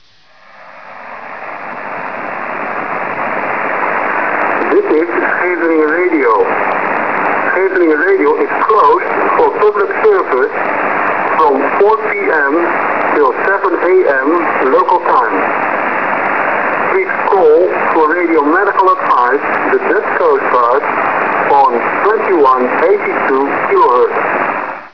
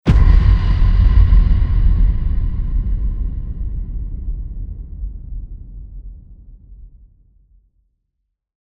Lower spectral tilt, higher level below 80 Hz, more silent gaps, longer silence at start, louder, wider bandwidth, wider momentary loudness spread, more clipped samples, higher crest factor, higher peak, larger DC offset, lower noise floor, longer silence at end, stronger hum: second, -7 dB/octave vs -9 dB/octave; second, -56 dBFS vs -16 dBFS; neither; first, 0.6 s vs 0.05 s; first, -12 LUFS vs -18 LUFS; about the same, 5.4 kHz vs 5 kHz; second, 7 LU vs 23 LU; neither; second, 10 dB vs 16 dB; about the same, -2 dBFS vs 0 dBFS; first, 1% vs under 0.1%; second, -45 dBFS vs -74 dBFS; second, 0.05 s vs 1.75 s; neither